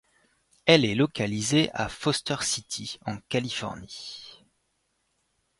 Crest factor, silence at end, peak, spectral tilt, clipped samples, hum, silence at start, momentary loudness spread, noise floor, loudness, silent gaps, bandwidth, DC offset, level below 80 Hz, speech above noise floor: 26 dB; 1.25 s; -2 dBFS; -4 dB/octave; under 0.1%; none; 0.65 s; 18 LU; -74 dBFS; -26 LUFS; none; 11.5 kHz; under 0.1%; -58 dBFS; 48 dB